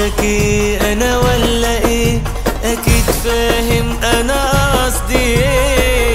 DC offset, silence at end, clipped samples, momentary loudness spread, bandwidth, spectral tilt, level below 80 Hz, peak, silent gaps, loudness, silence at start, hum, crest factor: under 0.1%; 0 s; under 0.1%; 3 LU; 16.5 kHz; -4 dB/octave; -18 dBFS; 0 dBFS; none; -14 LUFS; 0 s; none; 14 dB